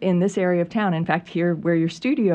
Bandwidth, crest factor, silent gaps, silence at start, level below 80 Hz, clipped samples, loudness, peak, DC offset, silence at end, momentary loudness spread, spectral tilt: 8.8 kHz; 14 dB; none; 0 s; -62 dBFS; under 0.1%; -22 LUFS; -6 dBFS; under 0.1%; 0 s; 3 LU; -7.5 dB/octave